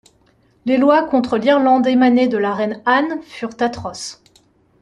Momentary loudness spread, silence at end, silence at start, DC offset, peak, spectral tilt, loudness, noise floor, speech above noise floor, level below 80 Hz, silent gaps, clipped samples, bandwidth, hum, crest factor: 14 LU; 0.7 s; 0.65 s; under 0.1%; -2 dBFS; -5 dB/octave; -16 LUFS; -56 dBFS; 41 dB; -56 dBFS; none; under 0.1%; 10.5 kHz; none; 16 dB